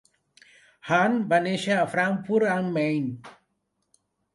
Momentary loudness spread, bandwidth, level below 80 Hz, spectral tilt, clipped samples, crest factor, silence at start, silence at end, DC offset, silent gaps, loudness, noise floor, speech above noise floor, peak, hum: 9 LU; 11.5 kHz; -70 dBFS; -6 dB/octave; under 0.1%; 18 dB; 0.85 s; 1.05 s; under 0.1%; none; -24 LUFS; -76 dBFS; 52 dB; -8 dBFS; none